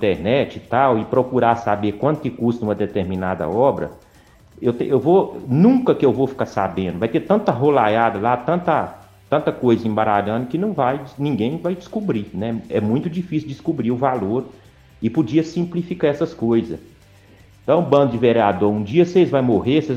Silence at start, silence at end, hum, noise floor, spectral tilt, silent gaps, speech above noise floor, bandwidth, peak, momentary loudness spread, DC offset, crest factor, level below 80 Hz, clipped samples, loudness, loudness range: 0 s; 0 s; none; -49 dBFS; -8 dB/octave; none; 31 dB; 8.8 kHz; -2 dBFS; 9 LU; under 0.1%; 18 dB; -52 dBFS; under 0.1%; -19 LUFS; 5 LU